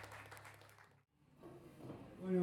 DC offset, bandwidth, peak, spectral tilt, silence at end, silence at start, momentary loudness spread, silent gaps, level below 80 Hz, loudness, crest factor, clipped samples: under 0.1%; 16 kHz; -28 dBFS; -7.5 dB/octave; 0 s; 0 s; 15 LU; none; -76 dBFS; -51 LUFS; 20 dB; under 0.1%